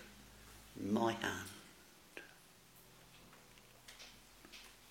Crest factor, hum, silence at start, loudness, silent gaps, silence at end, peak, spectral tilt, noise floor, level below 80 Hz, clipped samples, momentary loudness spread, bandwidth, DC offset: 26 dB; none; 0 s; -43 LUFS; none; 0 s; -22 dBFS; -4.5 dB/octave; -63 dBFS; -70 dBFS; under 0.1%; 24 LU; 16.5 kHz; under 0.1%